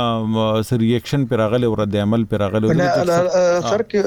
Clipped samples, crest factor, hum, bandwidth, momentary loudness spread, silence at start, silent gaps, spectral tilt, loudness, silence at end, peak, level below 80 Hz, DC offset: under 0.1%; 10 dB; none; 18.5 kHz; 3 LU; 0 s; none; -6.5 dB/octave; -18 LUFS; 0 s; -8 dBFS; -46 dBFS; under 0.1%